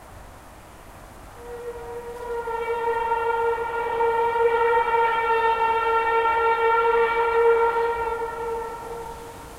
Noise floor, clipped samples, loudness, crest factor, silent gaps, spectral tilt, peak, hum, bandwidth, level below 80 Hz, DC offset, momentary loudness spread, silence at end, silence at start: -44 dBFS; under 0.1%; -22 LUFS; 14 dB; none; -4 dB/octave; -8 dBFS; none; 15 kHz; -48 dBFS; under 0.1%; 16 LU; 0 s; 0 s